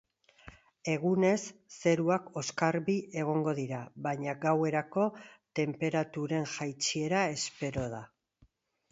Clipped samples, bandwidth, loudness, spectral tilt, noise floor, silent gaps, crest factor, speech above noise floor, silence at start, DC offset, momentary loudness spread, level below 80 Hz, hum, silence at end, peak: under 0.1%; 8 kHz; -32 LUFS; -5 dB/octave; -68 dBFS; none; 20 dB; 37 dB; 0.45 s; under 0.1%; 9 LU; -66 dBFS; none; 0.85 s; -12 dBFS